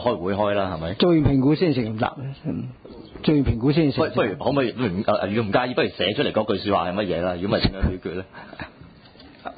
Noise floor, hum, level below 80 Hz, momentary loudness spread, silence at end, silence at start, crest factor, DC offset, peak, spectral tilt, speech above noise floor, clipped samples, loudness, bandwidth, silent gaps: -47 dBFS; none; -38 dBFS; 16 LU; 0 s; 0 s; 16 dB; under 0.1%; -6 dBFS; -11.5 dB/octave; 25 dB; under 0.1%; -22 LUFS; 5 kHz; none